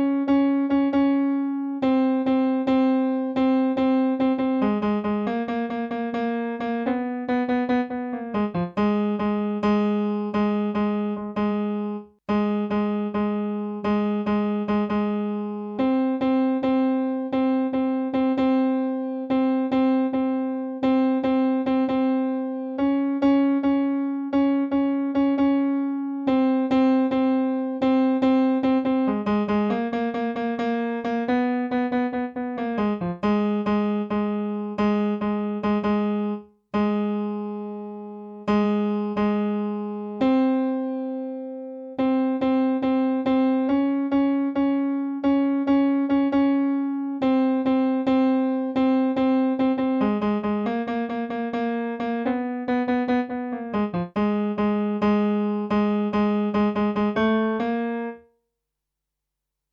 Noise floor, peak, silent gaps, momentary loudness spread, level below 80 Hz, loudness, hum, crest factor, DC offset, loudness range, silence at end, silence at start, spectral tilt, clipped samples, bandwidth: -83 dBFS; -10 dBFS; none; 7 LU; -56 dBFS; -23 LUFS; none; 12 dB; under 0.1%; 4 LU; 1.55 s; 0 s; -9 dB/octave; under 0.1%; 5.4 kHz